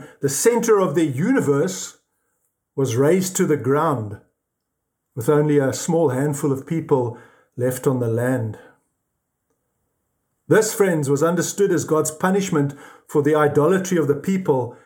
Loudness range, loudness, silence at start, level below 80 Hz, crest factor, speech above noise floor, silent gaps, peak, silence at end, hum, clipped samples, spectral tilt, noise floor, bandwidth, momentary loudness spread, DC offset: 5 LU; -20 LUFS; 0 s; -66 dBFS; 16 dB; 58 dB; none; -4 dBFS; 0.1 s; none; under 0.1%; -5.5 dB/octave; -78 dBFS; 19 kHz; 8 LU; under 0.1%